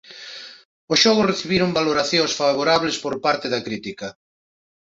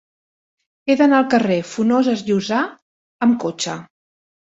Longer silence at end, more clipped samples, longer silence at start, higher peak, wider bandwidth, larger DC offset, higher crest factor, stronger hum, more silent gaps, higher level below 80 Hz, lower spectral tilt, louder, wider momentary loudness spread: about the same, 0.75 s vs 0.75 s; neither; second, 0.1 s vs 0.85 s; about the same, -2 dBFS vs -2 dBFS; about the same, 8 kHz vs 8 kHz; neither; about the same, 20 dB vs 18 dB; neither; second, 0.65-0.88 s vs 2.82-3.19 s; first, -56 dBFS vs -64 dBFS; second, -3.5 dB/octave vs -5 dB/octave; about the same, -19 LUFS vs -18 LUFS; first, 19 LU vs 11 LU